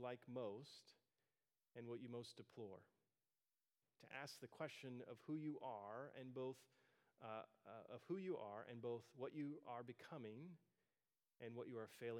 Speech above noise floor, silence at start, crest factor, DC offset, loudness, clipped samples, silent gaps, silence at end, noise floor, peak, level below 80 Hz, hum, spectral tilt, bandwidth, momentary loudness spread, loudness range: over 36 dB; 0 s; 20 dB; under 0.1%; -55 LUFS; under 0.1%; none; 0 s; under -90 dBFS; -36 dBFS; under -90 dBFS; none; -6 dB/octave; 16 kHz; 10 LU; 5 LU